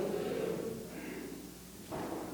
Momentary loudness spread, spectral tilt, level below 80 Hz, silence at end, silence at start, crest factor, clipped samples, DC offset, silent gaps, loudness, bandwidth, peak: 11 LU; -5.5 dB/octave; -62 dBFS; 0 s; 0 s; 14 dB; under 0.1%; under 0.1%; none; -41 LUFS; over 20 kHz; -26 dBFS